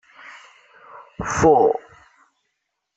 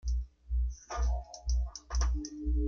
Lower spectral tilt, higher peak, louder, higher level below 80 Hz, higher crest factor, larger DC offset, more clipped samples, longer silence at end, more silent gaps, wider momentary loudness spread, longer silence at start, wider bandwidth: about the same, -5.5 dB/octave vs -5.5 dB/octave; first, -2 dBFS vs -18 dBFS; first, -18 LUFS vs -36 LUFS; second, -48 dBFS vs -32 dBFS; first, 20 dB vs 14 dB; neither; neither; first, 1.15 s vs 0 s; neither; first, 27 LU vs 5 LU; first, 0.3 s vs 0.05 s; first, 8.2 kHz vs 7 kHz